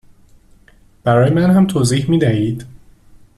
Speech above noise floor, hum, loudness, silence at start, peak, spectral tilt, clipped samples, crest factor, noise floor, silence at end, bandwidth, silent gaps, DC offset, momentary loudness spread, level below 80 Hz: 35 dB; none; -14 LUFS; 1.05 s; -4 dBFS; -7 dB/octave; under 0.1%; 14 dB; -48 dBFS; 0.7 s; 13 kHz; none; under 0.1%; 10 LU; -46 dBFS